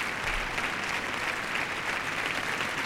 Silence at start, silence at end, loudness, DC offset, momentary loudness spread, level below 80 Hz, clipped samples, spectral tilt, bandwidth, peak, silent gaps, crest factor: 0 s; 0 s; -30 LUFS; under 0.1%; 1 LU; -48 dBFS; under 0.1%; -2.5 dB/octave; 16 kHz; -16 dBFS; none; 14 dB